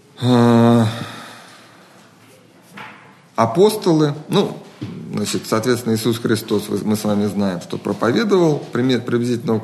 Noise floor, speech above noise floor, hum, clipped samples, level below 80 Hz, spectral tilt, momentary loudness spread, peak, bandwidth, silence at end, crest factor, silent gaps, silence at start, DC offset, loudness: -47 dBFS; 30 dB; none; under 0.1%; -62 dBFS; -6 dB/octave; 17 LU; 0 dBFS; 13 kHz; 0 s; 18 dB; none; 0.2 s; under 0.1%; -18 LUFS